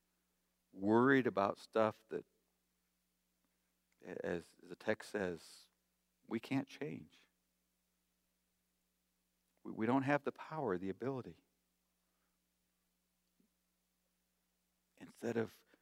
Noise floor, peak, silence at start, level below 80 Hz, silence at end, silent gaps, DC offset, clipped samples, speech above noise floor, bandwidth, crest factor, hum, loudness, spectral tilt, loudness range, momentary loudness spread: -84 dBFS; -18 dBFS; 0.75 s; -82 dBFS; 0.3 s; none; under 0.1%; under 0.1%; 45 dB; 15.5 kHz; 24 dB; 60 Hz at -80 dBFS; -39 LUFS; -7 dB/octave; 12 LU; 19 LU